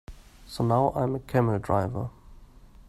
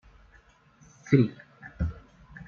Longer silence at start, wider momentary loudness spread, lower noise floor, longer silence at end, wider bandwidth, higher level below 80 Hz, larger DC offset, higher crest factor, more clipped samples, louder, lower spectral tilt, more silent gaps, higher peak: second, 0.1 s vs 1.05 s; second, 12 LU vs 27 LU; second, -50 dBFS vs -59 dBFS; first, 0.2 s vs 0.05 s; first, 13.5 kHz vs 7 kHz; about the same, -48 dBFS vs -46 dBFS; neither; about the same, 20 dB vs 24 dB; neither; about the same, -27 LUFS vs -27 LUFS; about the same, -8 dB/octave vs -8.5 dB/octave; neither; about the same, -8 dBFS vs -6 dBFS